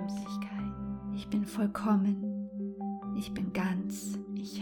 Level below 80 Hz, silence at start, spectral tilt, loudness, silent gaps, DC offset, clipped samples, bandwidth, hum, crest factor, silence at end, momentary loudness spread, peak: -58 dBFS; 0 s; -6.5 dB/octave; -34 LUFS; none; under 0.1%; under 0.1%; 18 kHz; none; 16 dB; 0 s; 10 LU; -18 dBFS